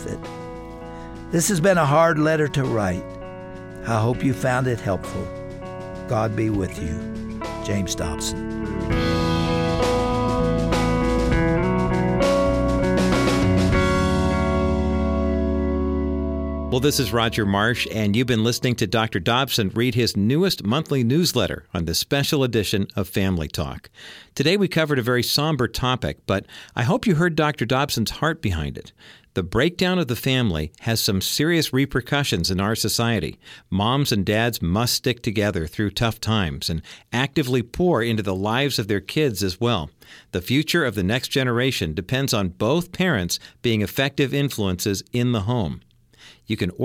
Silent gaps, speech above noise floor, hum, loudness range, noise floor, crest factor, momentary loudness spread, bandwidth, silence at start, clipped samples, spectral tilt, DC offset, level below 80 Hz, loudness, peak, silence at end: none; 28 dB; none; 4 LU; -50 dBFS; 16 dB; 10 LU; 17 kHz; 0 s; under 0.1%; -5 dB/octave; under 0.1%; -36 dBFS; -22 LUFS; -6 dBFS; 0 s